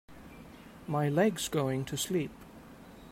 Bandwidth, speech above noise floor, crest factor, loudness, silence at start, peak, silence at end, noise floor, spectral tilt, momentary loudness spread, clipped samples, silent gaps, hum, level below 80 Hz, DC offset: 16 kHz; 21 dB; 18 dB; -31 LUFS; 0.1 s; -14 dBFS; 0 s; -51 dBFS; -5 dB/octave; 23 LU; under 0.1%; none; none; -60 dBFS; under 0.1%